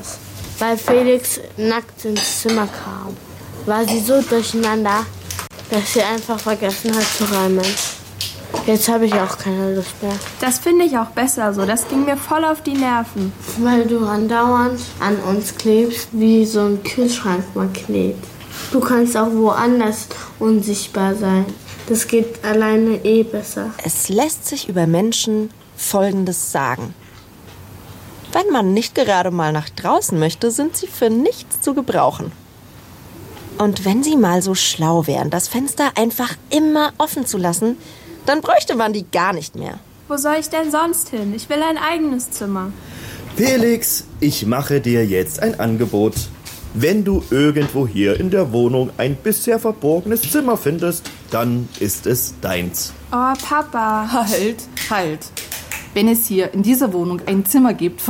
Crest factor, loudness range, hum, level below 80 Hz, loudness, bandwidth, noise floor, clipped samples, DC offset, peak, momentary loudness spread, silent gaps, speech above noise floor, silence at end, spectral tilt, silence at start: 14 dB; 3 LU; none; -46 dBFS; -18 LUFS; 17 kHz; -41 dBFS; under 0.1%; under 0.1%; -4 dBFS; 11 LU; none; 24 dB; 0 s; -4.5 dB/octave; 0 s